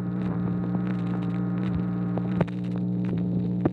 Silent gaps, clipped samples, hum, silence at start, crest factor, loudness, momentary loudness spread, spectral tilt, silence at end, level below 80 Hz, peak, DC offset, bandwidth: none; under 0.1%; 60 Hz at -35 dBFS; 0 s; 18 dB; -28 LUFS; 1 LU; -10.5 dB/octave; 0 s; -48 dBFS; -8 dBFS; under 0.1%; 4.4 kHz